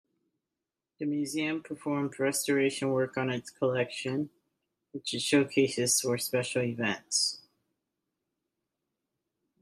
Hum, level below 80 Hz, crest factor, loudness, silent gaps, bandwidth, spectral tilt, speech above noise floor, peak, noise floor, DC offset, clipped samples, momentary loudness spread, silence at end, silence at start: none; -76 dBFS; 20 dB; -30 LUFS; none; 15.5 kHz; -3.5 dB/octave; 59 dB; -12 dBFS; -89 dBFS; under 0.1%; under 0.1%; 9 LU; 2.2 s; 1 s